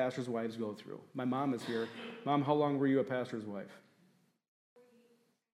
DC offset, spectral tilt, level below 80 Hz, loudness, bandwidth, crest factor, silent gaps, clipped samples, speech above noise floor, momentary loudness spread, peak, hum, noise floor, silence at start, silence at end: under 0.1%; -7 dB/octave; -86 dBFS; -36 LUFS; 12.5 kHz; 20 dB; none; under 0.1%; 36 dB; 15 LU; -18 dBFS; none; -72 dBFS; 0 s; 1.75 s